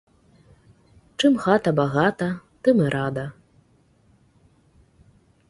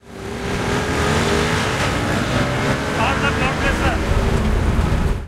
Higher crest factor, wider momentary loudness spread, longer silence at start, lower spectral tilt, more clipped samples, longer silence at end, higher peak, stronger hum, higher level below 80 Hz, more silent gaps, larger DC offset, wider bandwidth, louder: first, 22 dB vs 14 dB; first, 11 LU vs 3 LU; first, 1.2 s vs 0.05 s; first, -6.5 dB/octave vs -5 dB/octave; neither; first, 2.2 s vs 0 s; about the same, -4 dBFS vs -4 dBFS; neither; second, -58 dBFS vs -24 dBFS; neither; neither; second, 11.5 kHz vs 16 kHz; second, -22 LUFS vs -19 LUFS